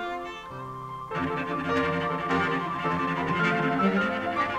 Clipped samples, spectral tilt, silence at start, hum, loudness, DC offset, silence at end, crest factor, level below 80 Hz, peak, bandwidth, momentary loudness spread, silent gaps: under 0.1%; -6.5 dB/octave; 0 s; none; -27 LUFS; under 0.1%; 0 s; 16 dB; -58 dBFS; -10 dBFS; 14 kHz; 13 LU; none